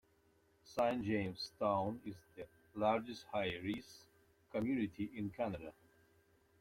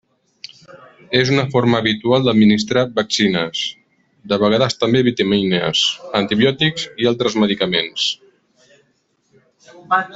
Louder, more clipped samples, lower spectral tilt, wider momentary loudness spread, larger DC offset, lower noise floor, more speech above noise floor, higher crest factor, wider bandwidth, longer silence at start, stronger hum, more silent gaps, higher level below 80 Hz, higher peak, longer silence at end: second, -40 LUFS vs -17 LUFS; neither; first, -6.5 dB/octave vs -5 dB/octave; first, 17 LU vs 7 LU; neither; first, -73 dBFS vs -63 dBFS; second, 34 dB vs 47 dB; about the same, 20 dB vs 16 dB; first, 16.5 kHz vs 8 kHz; about the same, 0.65 s vs 0.75 s; neither; neither; second, -70 dBFS vs -54 dBFS; second, -20 dBFS vs -2 dBFS; first, 0.9 s vs 0 s